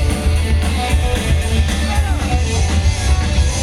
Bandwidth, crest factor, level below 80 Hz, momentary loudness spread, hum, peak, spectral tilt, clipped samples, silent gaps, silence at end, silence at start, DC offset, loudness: 13 kHz; 12 dB; -16 dBFS; 1 LU; none; -4 dBFS; -5 dB/octave; under 0.1%; none; 0 s; 0 s; under 0.1%; -17 LUFS